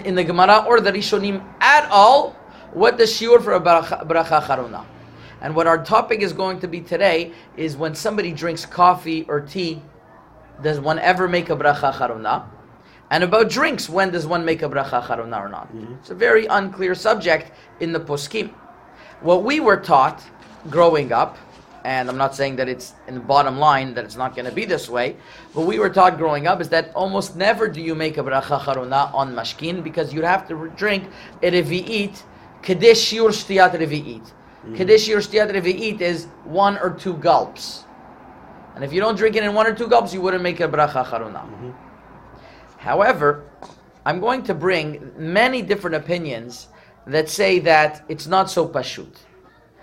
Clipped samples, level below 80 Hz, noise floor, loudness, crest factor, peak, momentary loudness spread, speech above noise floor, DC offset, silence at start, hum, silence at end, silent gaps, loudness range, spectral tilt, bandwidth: under 0.1%; -54 dBFS; -50 dBFS; -18 LUFS; 20 dB; 0 dBFS; 15 LU; 32 dB; under 0.1%; 0 s; none; 0.8 s; none; 5 LU; -4.5 dB/octave; 16 kHz